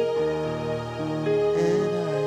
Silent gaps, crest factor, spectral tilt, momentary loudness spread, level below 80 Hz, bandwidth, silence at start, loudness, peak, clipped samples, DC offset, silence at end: none; 10 dB; -7 dB/octave; 7 LU; -54 dBFS; 10.5 kHz; 0 s; -25 LUFS; -14 dBFS; under 0.1%; under 0.1%; 0 s